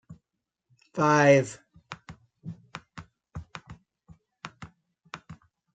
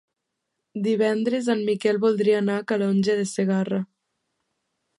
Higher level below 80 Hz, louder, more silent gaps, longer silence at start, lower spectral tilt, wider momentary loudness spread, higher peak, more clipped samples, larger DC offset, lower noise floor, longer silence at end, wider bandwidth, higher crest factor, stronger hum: first, -62 dBFS vs -72 dBFS; about the same, -23 LUFS vs -23 LUFS; neither; second, 0.1 s vs 0.75 s; about the same, -6 dB/octave vs -6 dB/octave; first, 28 LU vs 7 LU; about the same, -8 dBFS vs -8 dBFS; neither; neither; first, -85 dBFS vs -80 dBFS; second, 0.45 s vs 1.15 s; second, 9.2 kHz vs 11.5 kHz; first, 22 dB vs 16 dB; neither